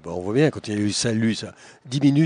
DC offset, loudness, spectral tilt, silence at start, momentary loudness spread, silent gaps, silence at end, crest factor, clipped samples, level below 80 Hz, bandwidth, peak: under 0.1%; -23 LUFS; -5.5 dB/octave; 0.05 s; 9 LU; none; 0 s; 16 dB; under 0.1%; -58 dBFS; 10 kHz; -6 dBFS